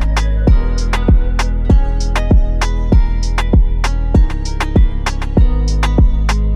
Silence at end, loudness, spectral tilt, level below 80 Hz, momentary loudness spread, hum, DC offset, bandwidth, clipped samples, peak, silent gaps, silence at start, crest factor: 0 s; -15 LUFS; -6.5 dB/octave; -12 dBFS; 4 LU; none; under 0.1%; 10 kHz; under 0.1%; -4 dBFS; none; 0 s; 8 dB